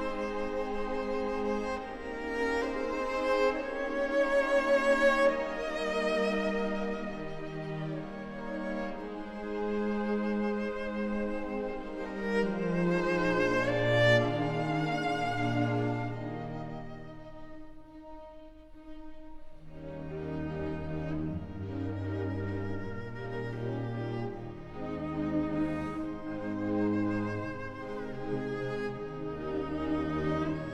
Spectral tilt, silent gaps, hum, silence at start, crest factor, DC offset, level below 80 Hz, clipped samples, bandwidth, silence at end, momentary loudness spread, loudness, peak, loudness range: -6.5 dB/octave; none; none; 0 s; 20 dB; under 0.1%; -50 dBFS; under 0.1%; 12 kHz; 0 s; 14 LU; -32 LUFS; -12 dBFS; 11 LU